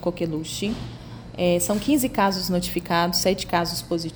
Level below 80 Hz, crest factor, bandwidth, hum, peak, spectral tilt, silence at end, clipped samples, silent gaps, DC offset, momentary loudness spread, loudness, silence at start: -44 dBFS; 18 dB; over 20 kHz; none; -6 dBFS; -4.5 dB/octave; 0 s; under 0.1%; none; under 0.1%; 9 LU; -23 LUFS; 0 s